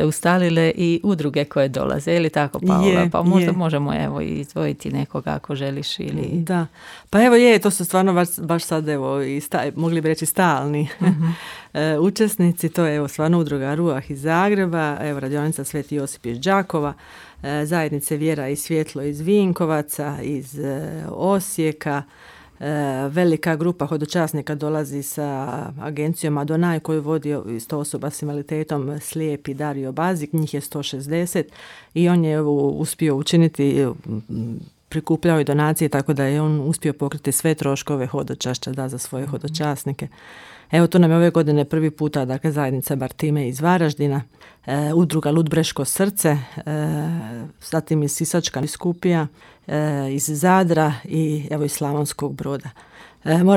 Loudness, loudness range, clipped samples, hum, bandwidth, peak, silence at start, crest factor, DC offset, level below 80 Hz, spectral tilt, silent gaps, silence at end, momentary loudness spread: -21 LUFS; 5 LU; under 0.1%; none; 16.5 kHz; -4 dBFS; 0 s; 18 dB; under 0.1%; -54 dBFS; -6 dB/octave; none; 0 s; 10 LU